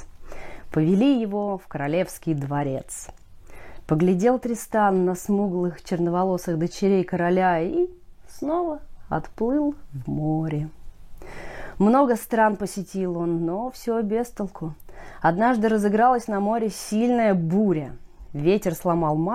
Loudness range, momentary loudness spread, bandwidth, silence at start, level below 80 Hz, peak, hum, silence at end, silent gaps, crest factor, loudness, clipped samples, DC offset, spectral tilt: 4 LU; 16 LU; 16 kHz; 0 s; -46 dBFS; -6 dBFS; none; 0 s; none; 16 dB; -23 LUFS; under 0.1%; under 0.1%; -7 dB/octave